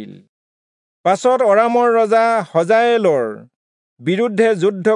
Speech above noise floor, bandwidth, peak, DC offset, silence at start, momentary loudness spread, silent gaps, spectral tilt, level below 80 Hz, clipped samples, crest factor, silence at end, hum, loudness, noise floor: over 75 dB; 10.5 kHz; -2 dBFS; under 0.1%; 0 s; 9 LU; 0.29-1.04 s, 3.56-3.97 s; -5.5 dB/octave; -78 dBFS; under 0.1%; 14 dB; 0 s; none; -15 LUFS; under -90 dBFS